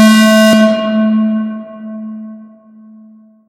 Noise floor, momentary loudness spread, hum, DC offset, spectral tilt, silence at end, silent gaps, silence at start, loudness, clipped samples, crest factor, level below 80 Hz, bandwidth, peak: -41 dBFS; 20 LU; none; under 0.1%; -5 dB/octave; 1.05 s; none; 0 s; -10 LUFS; 0.4%; 12 dB; -64 dBFS; 16 kHz; 0 dBFS